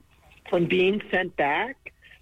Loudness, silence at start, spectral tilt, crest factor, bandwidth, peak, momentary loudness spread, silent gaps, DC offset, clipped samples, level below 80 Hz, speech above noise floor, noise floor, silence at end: -25 LUFS; 0.45 s; -7 dB/octave; 14 dB; 7.6 kHz; -12 dBFS; 15 LU; none; under 0.1%; under 0.1%; -58 dBFS; 26 dB; -50 dBFS; 0.5 s